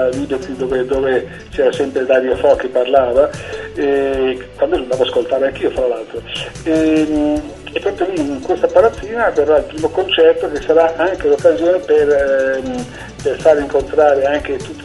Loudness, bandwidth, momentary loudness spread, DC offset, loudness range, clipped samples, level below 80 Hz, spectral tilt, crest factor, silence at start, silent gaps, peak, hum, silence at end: -15 LUFS; 11.5 kHz; 10 LU; under 0.1%; 4 LU; under 0.1%; -38 dBFS; -5.5 dB/octave; 14 dB; 0 s; none; 0 dBFS; none; 0 s